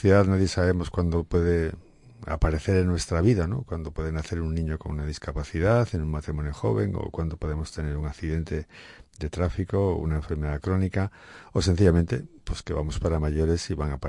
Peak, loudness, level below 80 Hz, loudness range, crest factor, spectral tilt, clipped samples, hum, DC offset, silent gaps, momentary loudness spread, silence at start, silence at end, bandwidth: -6 dBFS; -27 LUFS; -36 dBFS; 5 LU; 18 dB; -7 dB/octave; under 0.1%; none; under 0.1%; none; 11 LU; 0 s; 0 s; 11 kHz